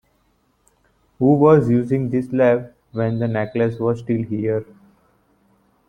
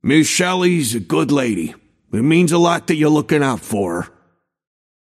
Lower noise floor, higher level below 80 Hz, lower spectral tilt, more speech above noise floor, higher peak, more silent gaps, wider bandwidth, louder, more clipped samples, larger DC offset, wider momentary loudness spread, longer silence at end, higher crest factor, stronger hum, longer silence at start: about the same, -63 dBFS vs -61 dBFS; about the same, -54 dBFS vs -56 dBFS; first, -10 dB/octave vs -5 dB/octave; about the same, 45 dB vs 46 dB; about the same, -2 dBFS vs -2 dBFS; neither; second, 9.2 kHz vs 15 kHz; second, -19 LUFS vs -16 LUFS; neither; neither; about the same, 10 LU vs 11 LU; first, 1.25 s vs 1.1 s; about the same, 18 dB vs 16 dB; neither; first, 1.2 s vs 0.05 s